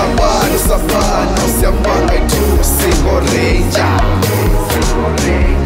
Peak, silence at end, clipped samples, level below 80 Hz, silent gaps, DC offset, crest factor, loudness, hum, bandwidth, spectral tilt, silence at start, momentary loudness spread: 0 dBFS; 0 s; under 0.1%; -16 dBFS; none; under 0.1%; 10 dB; -13 LUFS; none; 16.5 kHz; -5 dB/octave; 0 s; 2 LU